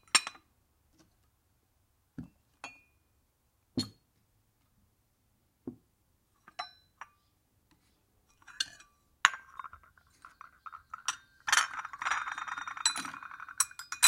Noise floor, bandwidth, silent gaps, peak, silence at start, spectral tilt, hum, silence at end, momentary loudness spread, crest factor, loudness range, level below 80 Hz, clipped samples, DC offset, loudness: -74 dBFS; 16.5 kHz; none; -2 dBFS; 0.15 s; 0.5 dB/octave; none; 0 s; 23 LU; 36 dB; 18 LU; -72 dBFS; under 0.1%; under 0.1%; -33 LUFS